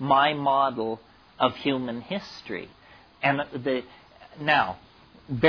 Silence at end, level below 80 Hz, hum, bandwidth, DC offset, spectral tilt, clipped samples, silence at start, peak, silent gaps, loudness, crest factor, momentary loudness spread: 0 s; -60 dBFS; none; 5.4 kHz; under 0.1%; -6.5 dB/octave; under 0.1%; 0 s; -6 dBFS; none; -26 LUFS; 20 dB; 14 LU